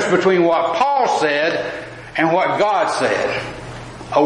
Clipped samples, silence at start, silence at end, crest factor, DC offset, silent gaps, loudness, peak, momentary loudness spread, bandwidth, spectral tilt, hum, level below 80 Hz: under 0.1%; 0 s; 0 s; 16 dB; under 0.1%; none; -17 LUFS; -2 dBFS; 15 LU; 11 kHz; -4.5 dB/octave; none; -50 dBFS